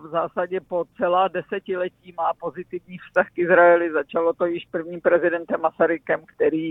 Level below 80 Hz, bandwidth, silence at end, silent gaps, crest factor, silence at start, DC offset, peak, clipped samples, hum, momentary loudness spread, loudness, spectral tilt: -66 dBFS; 3.9 kHz; 0 s; none; 18 dB; 0 s; under 0.1%; -4 dBFS; under 0.1%; none; 13 LU; -22 LUFS; -8.5 dB/octave